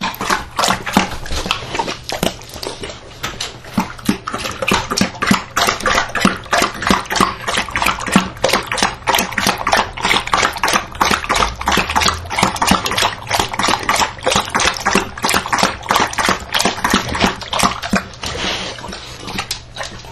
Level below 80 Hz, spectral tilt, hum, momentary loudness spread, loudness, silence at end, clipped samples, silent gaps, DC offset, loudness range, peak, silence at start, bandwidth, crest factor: -34 dBFS; -2.5 dB/octave; none; 10 LU; -16 LUFS; 0 s; under 0.1%; none; under 0.1%; 5 LU; 0 dBFS; 0 s; 16 kHz; 18 dB